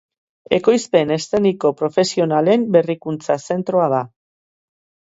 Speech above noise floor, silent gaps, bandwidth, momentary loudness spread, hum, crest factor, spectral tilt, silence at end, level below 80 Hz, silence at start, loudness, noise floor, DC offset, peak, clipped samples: over 73 dB; none; 8 kHz; 7 LU; none; 18 dB; -5.5 dB/octave; 1.05 s; -60 dBFS; 0.5 s; -18 LUFS; under -90 dBFS; under 0.1%; 0 dBFS; under 0.1%